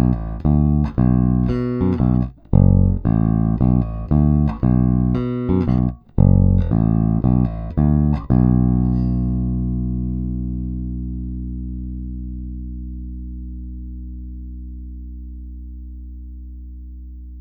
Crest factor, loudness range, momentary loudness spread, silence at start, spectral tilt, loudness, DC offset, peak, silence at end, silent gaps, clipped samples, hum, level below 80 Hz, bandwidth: 18 dB; 17 LU; 20 LU; 0 s; -12.5 dB/octave; -19 LUFS; under 0.1%; 0 dBFS; 0 s; none; under 0.1%; 60 Hz at -45 dBFS; -26 dBFS; 4.8 kHz